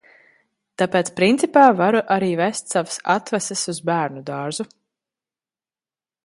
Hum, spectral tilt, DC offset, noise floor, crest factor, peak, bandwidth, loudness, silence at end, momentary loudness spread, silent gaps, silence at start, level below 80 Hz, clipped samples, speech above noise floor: none; -4.5 dB/octave; under 0.1%; under -90 dBFS; 20 dB; 0 dBFS; 11.5 kHz; -19 LUFS; 1.6 s; 14 LU; none; 0.8 s; -68 dBFS; under 0.1%; over 71 dB